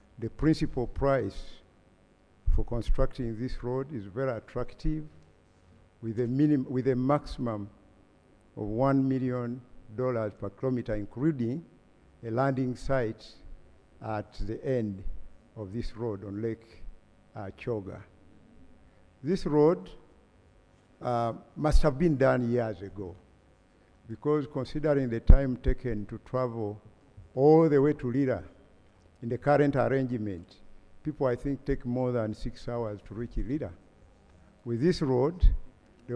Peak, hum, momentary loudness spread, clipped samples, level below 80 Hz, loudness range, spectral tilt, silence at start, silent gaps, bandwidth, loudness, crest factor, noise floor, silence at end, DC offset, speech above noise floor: 0 dBFS; none; 17 LU; under 0.1%; -34 dBFS; 9 LU; -8.5 dB/octave; 0.2 s; none; 10 kHz; -30 LUFS; 28 dB; -62 dBFS; 0 s; under 0.1%; 34 dB